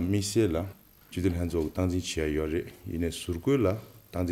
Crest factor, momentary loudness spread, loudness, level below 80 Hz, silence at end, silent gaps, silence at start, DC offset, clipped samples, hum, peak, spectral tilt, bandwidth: 16 dB; 12 LU; -30 LUFS; -46 dBFS; 0 s; none; 0 s; under 0.1%; under 0.1%; none; -14 dBFS; -6 dB/octave; 16.5 kHz